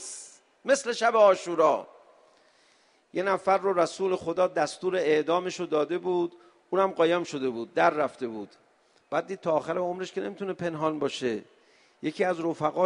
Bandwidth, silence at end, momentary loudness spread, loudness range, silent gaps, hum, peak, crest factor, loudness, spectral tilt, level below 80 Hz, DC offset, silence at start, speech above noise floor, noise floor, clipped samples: 10.5 kHz; 0 s; 12 LU; 5 LU; none; none; -8 dBFS; 20 dB; -27 LUFS; -4.5 dB/octave; -74 dBFS; under 0.1%; 0 s; 37 dB; -64 dBFS; under 0.1%